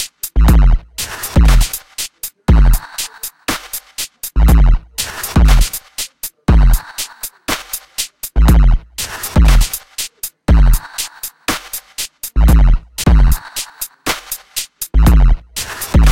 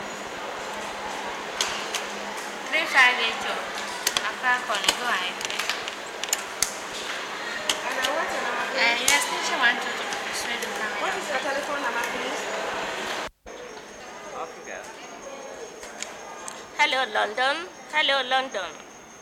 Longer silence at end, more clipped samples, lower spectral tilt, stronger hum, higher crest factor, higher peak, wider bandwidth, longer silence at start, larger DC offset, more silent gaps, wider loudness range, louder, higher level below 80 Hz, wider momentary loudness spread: about the same, 0 s vs 0 s; neither; first, -4.5 dB/octave vs 0 dB/octave; neither; second, 12 dB vs 24 dB; first, 0 dBFS vs -4 dBFS; about the same, 17 kHz vs 17 kHz; about the same, 0 s vs 0 s; first, 0.4% vs under 0.1%; neither; second, 2 LU vs 9 LU; first, -16 LUFS vs -25 LUFS; first, -14 dBFS vs -62 dBFS; second, 12 LU vs 16 LU